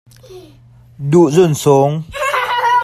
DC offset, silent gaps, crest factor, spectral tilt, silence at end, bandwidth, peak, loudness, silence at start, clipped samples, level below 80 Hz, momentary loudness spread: under 0.1%; none; 14 dB; -6 dB/octave; 0 s; 15 kHz; 0 dBFS; -13 LUFS; 0.3 s; under 0.1%; -48 dBFS; 8 LU